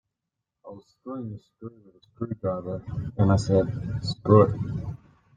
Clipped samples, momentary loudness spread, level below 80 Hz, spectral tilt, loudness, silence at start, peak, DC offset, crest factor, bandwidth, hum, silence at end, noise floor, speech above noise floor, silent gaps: under 0.1%; 25 LU; -50 dBFS; -8 dB/octave; -25 LUFS; 0.65 s; -4 dBFS; under 0.1%; 22 dB; 9.2 kHz; none; 0.4 s; -85 dBFS; 59 dB; none